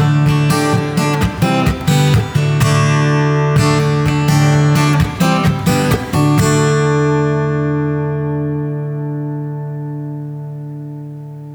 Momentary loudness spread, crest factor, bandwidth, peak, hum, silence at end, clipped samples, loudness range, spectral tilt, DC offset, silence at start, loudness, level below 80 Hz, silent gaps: 13 LU; 12 dB; over 20 kHz; -2 dBFS; none; 0 s; under 0.1%; 8 LU; -6 dB/octave; under 0.1%; 0 s; -14 LUFS; -34 dBFS; none